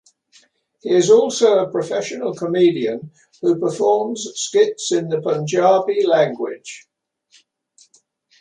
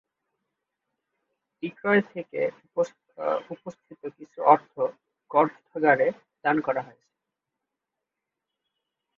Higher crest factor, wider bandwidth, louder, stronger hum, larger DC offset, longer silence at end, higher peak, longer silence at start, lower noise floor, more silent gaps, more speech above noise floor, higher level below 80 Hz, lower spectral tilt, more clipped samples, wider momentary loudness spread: second, 16 dB vs 26 dB; first, 10.5 kHz vs 7.4 kHz; first, -18 LUFS vs -26 LUFS; neither; neither; second, 1.6 s vs 2.35 s; about the same, -2 dBFS vs -2 dBFS; second, 0.85 s vs 1.65 s; second, -58 dBFS vs -86 dBFS; neither; second, 41 dB vs 60 dB; first, -70 dBFS vs -76 dBFS; second, -4.5 dB/octave vs -7 dB/octave; neither; second, 13 LU vs 19 LU